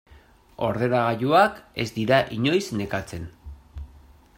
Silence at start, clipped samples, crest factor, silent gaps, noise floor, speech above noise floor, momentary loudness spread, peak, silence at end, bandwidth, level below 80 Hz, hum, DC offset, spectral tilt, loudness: 0.1 s; under 0.1%; 20 dB; none; -53 dBFS; 30 dB; 22 LU; -6 dBFS; 0.5 s; 16 kHz; -48 dBFS; none; under 0.1%; -6 dB/octave; -23 LUFS